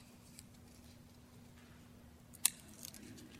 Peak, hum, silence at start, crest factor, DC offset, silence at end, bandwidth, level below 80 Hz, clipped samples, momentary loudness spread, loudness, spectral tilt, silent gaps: -6 dBFS; none; 0 s; 42 dB; under 0.1%; 0 s; 16.5 kHz; -68 dBFS; under 0.1%; 24 LU; -39 LUFS; -1 dB/octave; none